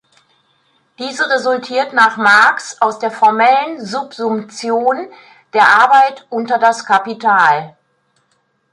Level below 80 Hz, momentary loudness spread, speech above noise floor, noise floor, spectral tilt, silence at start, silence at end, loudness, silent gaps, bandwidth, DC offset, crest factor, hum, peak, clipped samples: -68 dBFS; 13 LU; 49 dB; -62 dBFS; -3 dB/octave; 1 s; 1 s; -13 LUFS; none; 11.5 kHz; under 0.1%; 14 dB; none; 0 dBFS; under 0.1%